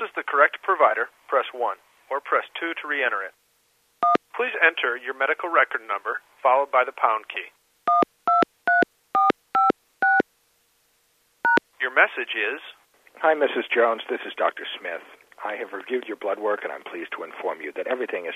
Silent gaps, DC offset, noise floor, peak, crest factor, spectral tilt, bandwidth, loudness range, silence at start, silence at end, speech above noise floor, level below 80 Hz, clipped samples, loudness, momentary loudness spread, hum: none; under 0.1%; -66 dBFS; -2 dBFS; 22 dB; -4.5 dB/octave; 14.5 kHz; 5 LU; 0 s; 0 s; 41 dB; -82 dBFS; under 0.1%; -23 LUFS; 13 LU; none